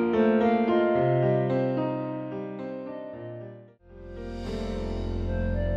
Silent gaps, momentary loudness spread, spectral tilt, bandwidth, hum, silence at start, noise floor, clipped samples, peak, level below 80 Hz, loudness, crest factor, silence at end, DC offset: none; 16 LU; -9 dB/octave; 7.8 kHz; none; 0 s; -48 dBFS; under 0.1%; -12 dBFS; -40 dBFS; -27 LUFS; 16 dB; 0 s; under 0.1%